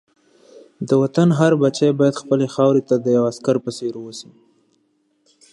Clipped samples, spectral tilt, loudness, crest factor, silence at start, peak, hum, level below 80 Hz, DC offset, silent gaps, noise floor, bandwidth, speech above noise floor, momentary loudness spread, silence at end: under 0.1%; -7 dB/octave; -18 LUFS; 18 dB; 0.8 s; -2 dBFS; none; -66 dBFS; under 0.1%; none; -65 dBFS; 11.5 kHz; 47 dB; 14 LU; 1.3 s